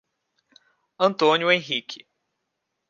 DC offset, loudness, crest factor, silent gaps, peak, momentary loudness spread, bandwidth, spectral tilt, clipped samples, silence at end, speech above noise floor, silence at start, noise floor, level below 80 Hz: under 0.1%; -21 LUFS; 22 dB; none; -4 dBFS; 18 LU; 7.4 kHz; -4.5 dB/octave; under 0.1%; 0.95 s; 58 dB; 1 s; -79 dBFS; -80 dBFS